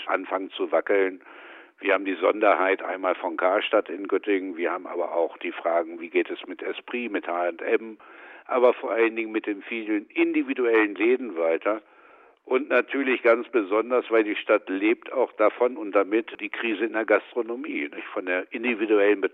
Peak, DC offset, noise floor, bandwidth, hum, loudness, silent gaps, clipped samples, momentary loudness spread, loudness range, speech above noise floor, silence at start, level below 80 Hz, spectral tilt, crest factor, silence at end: -6 dBFS; under 0.1%; -54 dBFS; 4.3 kHz; none; -25 LUFS; none; under 0.1%; 9 LU; 4 LU; 29 dB; 0 s; -82 dBFS; -6.5 dB/octave; 20 dB; 0.05 s